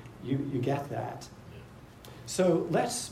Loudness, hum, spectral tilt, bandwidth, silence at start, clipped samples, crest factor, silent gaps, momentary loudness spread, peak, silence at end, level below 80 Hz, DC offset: -31 LUFS; none; -5.5 dB/octave; 16 kHz; 0 s; under 0.1%; 18 dB; none; 22 LU; -14 dBFS; 0 s; -60 dBFS; under 0.1%